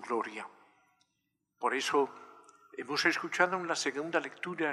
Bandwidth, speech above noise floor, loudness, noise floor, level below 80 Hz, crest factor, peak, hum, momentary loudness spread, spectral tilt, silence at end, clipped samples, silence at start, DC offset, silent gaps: 13.5 kHz; 50 dB; -32 LUFS; -82 dBFS; under -90 dBFS; 24 dB; -10 dBFS; 50 Hz at -70 dBFS; 16 LU; -3 dB/octave; 0 s; under 0.1%; 0 s; under 0.1%; none